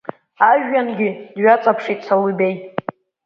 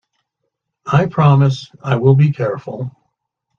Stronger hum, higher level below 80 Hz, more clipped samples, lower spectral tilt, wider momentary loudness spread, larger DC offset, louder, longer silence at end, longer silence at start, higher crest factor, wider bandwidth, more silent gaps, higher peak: neither; second, -70 dBFS vs -52 dBFS; neither; about the same, -8 dB/octave vs -8.5 dB/octave; about the same, 14 LU vs 16 LU; neither; about the same, -17 LUFS vs -15 LUFS; second, 0.45 s vs 0.7 s; second, 0.1 s vs 0.85 s; about the same, 18 dB vs 16 dB; about the same, 6.6 kHz vs 7 kHz; neither; about the same, 0 dBFS vs 0 dBFS